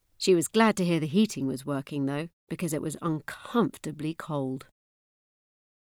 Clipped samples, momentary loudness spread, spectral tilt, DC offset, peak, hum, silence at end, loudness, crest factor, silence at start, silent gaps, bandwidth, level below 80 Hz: under 0.1%; 12 LU; -5.5 dB/octave; under 0.1%; -10 dBFS; none; 1.2 s; -28 LUFS; 20 dB; 0.2 s; 2.33-2.47 s; 17.5 kHz; -66 dBFS